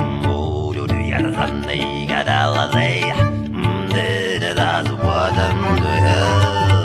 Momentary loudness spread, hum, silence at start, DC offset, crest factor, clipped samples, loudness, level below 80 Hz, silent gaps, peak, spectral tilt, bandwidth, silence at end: 6 LU; none; 0 s; under 0.1%; 14 dB; under 0.1%; -18 LUFS; -34 dBFS; none; -2 dBFS; -6 dB/octave; 12.5 kHz; 0 s